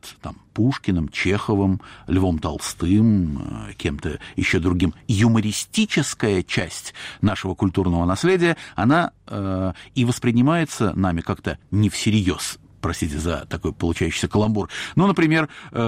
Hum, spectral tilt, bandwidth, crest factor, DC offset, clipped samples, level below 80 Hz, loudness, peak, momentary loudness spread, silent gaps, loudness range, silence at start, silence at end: none; -5.5 dB/octave; 16 kHz; 14 dB; under 0.1%; under 0.1%; -40 dBFS; -21 LUFS; -8 dBFS; 10 LU; none; 2 LU; 0.05 s; 0 s